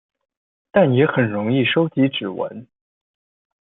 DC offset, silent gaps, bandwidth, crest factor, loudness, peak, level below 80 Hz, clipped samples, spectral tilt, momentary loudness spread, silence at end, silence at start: under 0.1%; none; 4 kHz; 18 dB; -19 LUFS; -2 dBFS; -62 dBFS; under 0.1%; -11.5 dB/octave; 11 LU; 0.95 s; 0.75 s